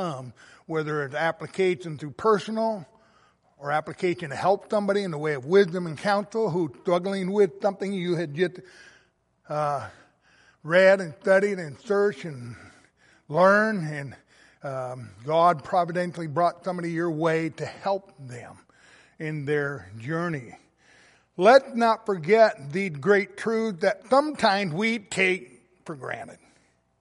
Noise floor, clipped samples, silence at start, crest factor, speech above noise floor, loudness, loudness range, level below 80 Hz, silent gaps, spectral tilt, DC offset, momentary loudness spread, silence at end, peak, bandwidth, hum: -64 dBFS; under 0.1%; 0 s; 22 dB; 40 dB; -25 LUFS; 6 LU; -70 dBFS; none; -6 dB/octave; under 0.1%; 17 LU; 0.65 s; -4 dBFS; 11.5 kHz; none